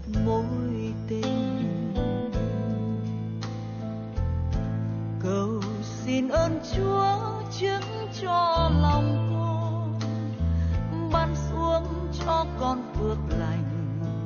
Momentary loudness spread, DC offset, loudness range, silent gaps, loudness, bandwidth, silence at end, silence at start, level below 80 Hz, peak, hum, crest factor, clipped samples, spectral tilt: 8 LU; under 0.1%; 5 LU; none; -28 LUFS; 7 kHz; 0 s; 0 s; -36 dBFS; -10 dBFS; none; 16 dB; under 0.1%; -7 dB/octave